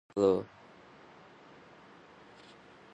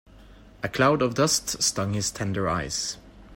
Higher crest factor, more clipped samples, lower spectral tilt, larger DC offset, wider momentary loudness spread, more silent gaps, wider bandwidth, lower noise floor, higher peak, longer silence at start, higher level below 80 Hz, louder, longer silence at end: about the same, 22 dB vs 18 dB; neither; first, -7 dB/octave vs -3.5 dB/octave; neither; first, 27 LU vs 11 LU; neither; second, 8.2 kHz vs 16.5 kHz; first, -56 dBFS vs -49 dBFS; second, -14 dBFS vs -8 dBFS; about the same, 0.15 s vs 0.15 s; second, -70 dBFS vs -50 dBFS; second, -30 LUFS vs -25 LUFS; first, 2.5 s vs 0 s